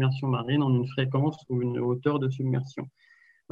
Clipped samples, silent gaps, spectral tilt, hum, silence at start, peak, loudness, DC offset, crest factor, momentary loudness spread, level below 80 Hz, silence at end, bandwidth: under 0.1%; none; -9 dB/octave; none; 0 s; -12 dBFS; -27 LUFS; under 0.1%; 16 dB; 8 LU; -68 dBFS; 0.65 s; 6.8 kHz